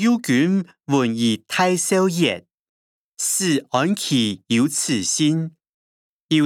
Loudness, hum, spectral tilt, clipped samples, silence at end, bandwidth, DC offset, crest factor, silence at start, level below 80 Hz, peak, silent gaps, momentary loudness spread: -20 LUFS; none; -4 dB/octave; under 0.1%; 0 s; 17.5 kHz; under 0.1%; 18 dB; 0 s; -72 dBFS; -4 dBFS; 2.54-3.12 s, 5.69-6.29 s; 5 LU